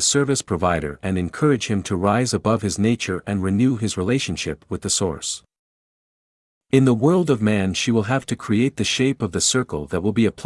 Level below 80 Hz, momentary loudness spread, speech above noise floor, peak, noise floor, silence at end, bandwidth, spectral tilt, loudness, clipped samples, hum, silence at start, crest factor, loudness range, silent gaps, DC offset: -50 dBFS; 7 LU; over 70 dB; -2 dBFS; under -90 dBFS; 0 s; 12 kHz; -4.5 dB/octave; -21 LUFS; under 0.1%; none; 0 s; 18 dB; 4 LU; 5.59-6.61 s; under 0.1%